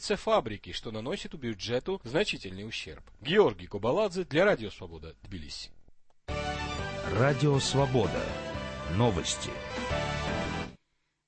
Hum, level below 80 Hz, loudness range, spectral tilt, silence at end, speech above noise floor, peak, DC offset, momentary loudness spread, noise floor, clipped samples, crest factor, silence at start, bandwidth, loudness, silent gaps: none; -48 dBFS; 3 LU; -5 dB/octave; 0.55 s; 46 dB; -10 dBFS; under 0.1%; 15 LU; -76 dBFS; under 0.1%; 20 dB; 0 s; 8.8 kHz; -30 LUFS; none